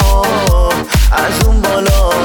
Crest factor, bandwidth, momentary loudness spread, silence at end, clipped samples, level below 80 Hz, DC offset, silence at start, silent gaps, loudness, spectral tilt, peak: 10 dB; 19 kHz; 1 LU; 0 s; under 0.1%; -12 dBFS; under 0.1%; 0 s; none; -12 LUFS; -4.5 dB/octave; 0 dBFS